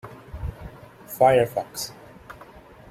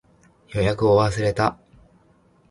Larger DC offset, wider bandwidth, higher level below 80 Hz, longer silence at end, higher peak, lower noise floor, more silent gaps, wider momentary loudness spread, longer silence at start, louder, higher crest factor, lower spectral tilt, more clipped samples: neither; first, 16.5 kHz vs 11.5 kHz; about the same, -46 dBFS vs -44 dBFS; second, 0.6 s vs 0.95 s; about the same, -6 dBFS vs -4 dBFS; second, -47 dBFS vs -58 dBFS; neither; first, 26 LU vs 6 LU; second, 0.05 s vs 0.5 s; about the same, -22 LUFS vs -21 LUFS; about the same, 20 dB vs 20 dB; second, -5 dB/octave vs -6.5 dB/octave; neither